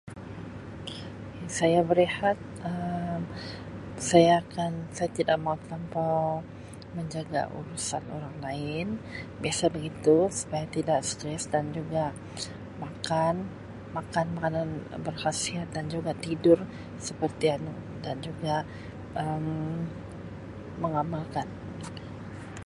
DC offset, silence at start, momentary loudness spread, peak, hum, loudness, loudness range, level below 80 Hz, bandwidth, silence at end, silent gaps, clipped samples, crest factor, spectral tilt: under 0.1%; 0.05 s; 17 LU; -6 dBFS; none; -29 LUFS; 7 LU; -54 dBFS; 11.5 kHz; 0.05 s; none; under 0.1%; 24 dB; -5 dB/octave